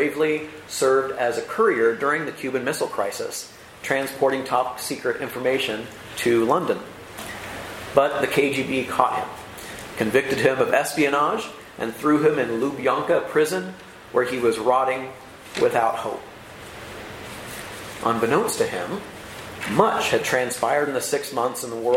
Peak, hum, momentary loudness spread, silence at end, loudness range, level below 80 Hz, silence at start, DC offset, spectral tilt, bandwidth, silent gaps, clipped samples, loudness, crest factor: -2 dBFS; none; 16 LU; 0 s; 4 LU; -58 dBFS; 0 s; under 0.1%; -4 dB/octave; 16.5 kHz; none; under 0.1%; -23 LUFS; 22 dB